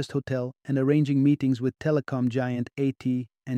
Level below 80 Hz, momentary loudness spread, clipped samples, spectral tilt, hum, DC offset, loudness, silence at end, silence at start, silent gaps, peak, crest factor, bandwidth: -64 dBFS; 8 LU; under 0.1%; -8.5 dB/octave; none; under 0.1%; -26 LUFS; 0 s; 0 s; none; -10 dBFS; 16 dB; 9.6 kHz